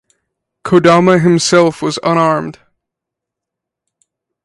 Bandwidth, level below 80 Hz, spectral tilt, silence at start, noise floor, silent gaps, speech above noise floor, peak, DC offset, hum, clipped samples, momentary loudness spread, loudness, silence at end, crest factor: 11.5 kHz; -52 dBFS; -5.5 dB/octave; 0.65 s; -81 dBFS; none; 71 dB; 0 dBFS; under 0.1%; none; under 0.1%; 10 LU; -11 LUFS; 1.95 s; 14 dB